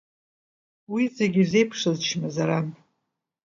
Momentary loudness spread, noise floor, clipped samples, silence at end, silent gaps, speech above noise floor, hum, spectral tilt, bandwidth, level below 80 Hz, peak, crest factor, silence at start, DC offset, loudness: 8 LU; -80 dBFS; under 0.1%; 0.7 s; none; 57 dB; none; -5.5 dB/octave; 7.6 kHz; -68 dBFS; -8 dBFS; 18 dB; 0.9 s; under 0.1%; -24 LUFS